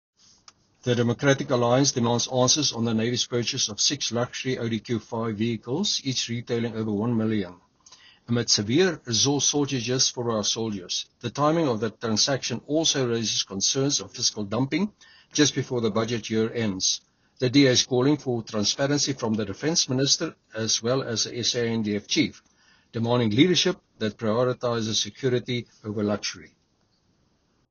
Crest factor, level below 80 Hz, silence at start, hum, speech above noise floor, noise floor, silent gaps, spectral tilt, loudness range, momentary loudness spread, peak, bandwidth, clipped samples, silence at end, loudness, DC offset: 20 dB; -62 dBFS; 0.85 s; none; 43 dB; -68 dBFS; none; -4 dB/octave; 4 LU; 9 LU; -6 dBFS; 7.2 kHz; under 0.1%; 1.25 s; -24 LUFS; under 0.1%